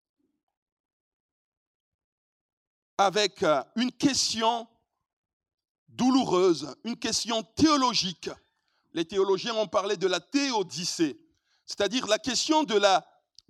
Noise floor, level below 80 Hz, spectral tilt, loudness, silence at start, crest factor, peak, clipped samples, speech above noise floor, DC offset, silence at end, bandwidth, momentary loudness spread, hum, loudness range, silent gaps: -73 dBFS; -66 dBFS; -3 dB/octave; -26 LUFS; 3 s; 22 dB; -8 dBFS; under 0.1%; 47 dB; under 0.1%; 0.5 s; 13.5 kHz; 10 LU; none; 4 LU; 5.13-5.24 s, 5.33-5.40 s, 5.70-5.86 s